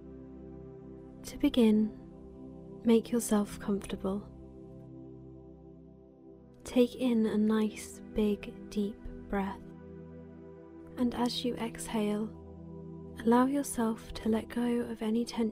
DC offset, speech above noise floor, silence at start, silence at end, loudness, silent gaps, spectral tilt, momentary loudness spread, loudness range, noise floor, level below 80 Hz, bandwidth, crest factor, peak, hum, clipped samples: under 0.1%; 24 dB; 0 s; 0 s; -31 LUFS; none; -5.5 dB/octave; 22 LU; 6 LU; -54 dBFS; -56 dBFS; 16 kHz; 20 dB; -14 dBFS; none; under 0.1%